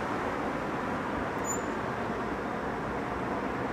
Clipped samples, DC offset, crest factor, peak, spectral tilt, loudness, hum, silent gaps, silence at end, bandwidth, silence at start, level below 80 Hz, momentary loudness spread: under 0.1%; under 0.1%; 12 dB; -20 dBFS; -5 dB/octave; -33 LUFS; none; none; 0 s; 15 kHz; 0 s; -52 dBFS; 2 LU